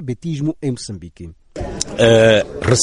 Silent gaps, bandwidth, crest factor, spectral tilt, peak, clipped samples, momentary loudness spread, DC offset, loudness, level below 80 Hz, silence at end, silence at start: none; 11.5 kHz; 16 dB; -4.5 dB/octave; 0 dBFS; under 0.1%; 21 LU; under 0.1%; -16 LUFS; -38 dBFS; 0 s; 0 s